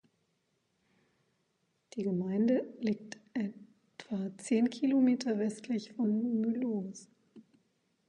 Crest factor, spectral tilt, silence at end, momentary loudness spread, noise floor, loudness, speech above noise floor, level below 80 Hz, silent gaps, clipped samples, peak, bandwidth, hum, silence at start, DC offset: 16 dB; -6.5 dB/octave; 0.7 s; 12 LU; -78 dBFS; -33 LUFS; 46 dB; -82 dBFS; none; under 0.1%; -18 dBFS; 10.5 kHz; none; 1.95 s; under 0.1%